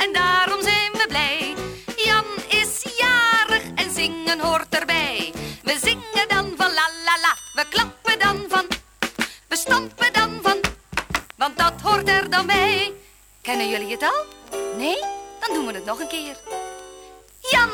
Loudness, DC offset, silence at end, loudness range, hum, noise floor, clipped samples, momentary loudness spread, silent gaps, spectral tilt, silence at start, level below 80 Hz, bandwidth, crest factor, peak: -20 LUFS; under 0.1%; 0 s; 6 LU; none; -49 dBFS; under 0.1%; 11 LU; none; -2 dB/octave; 0 s; -48 dBFS; over 20 kHz; 18 dB; -4 dBFS